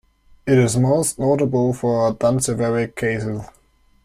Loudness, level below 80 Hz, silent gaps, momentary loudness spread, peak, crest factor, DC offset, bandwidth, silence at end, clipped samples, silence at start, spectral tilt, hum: -19 LUFS; -48 dBFS; none; 8 LU; -4 dBFS; 16 dB; under 0.1%; 15.5 kHz; 0.6 s; under 0.1%; 0.45 s; -6 dB/octave; none